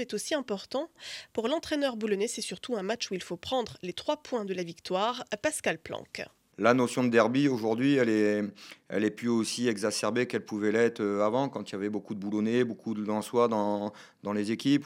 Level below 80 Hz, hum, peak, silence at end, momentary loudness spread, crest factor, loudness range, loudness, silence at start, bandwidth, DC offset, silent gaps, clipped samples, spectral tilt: -72 dBFS; none; -8 dBFS; 0 s; 11 LU; 22 dB; 6 LU; -30 LUFS; 0 s; 16 kHz; under 0.1%; none; under 0.1%; -4.5 dB/octave